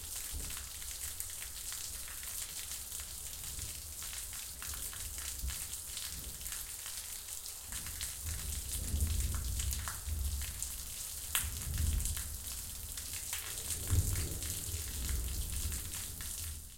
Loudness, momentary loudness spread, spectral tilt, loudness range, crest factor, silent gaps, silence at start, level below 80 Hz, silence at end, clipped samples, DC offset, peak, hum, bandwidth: -39 LUFS; 6 LU; -2 dB/octave; 3 LU; 28 dB; none; 0 s; -44 dBFS; 0 s; under 0.1%; under 0.1%; -10 dBFS; none; 17 kHz